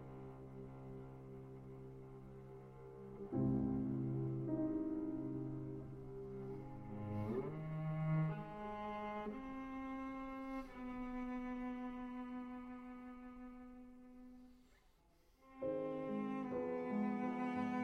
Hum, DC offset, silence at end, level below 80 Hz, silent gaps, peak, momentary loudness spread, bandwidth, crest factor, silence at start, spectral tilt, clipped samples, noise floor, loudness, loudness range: none; under 0.1%; 0 s; -62 dBFS; none; -28 dBFS; 16 LU; 6.6 kHz; 16 dB; 0 s; -9.5 dB/octave; under 0.1%; -71 dBFS; -45 LUFS; 10 LU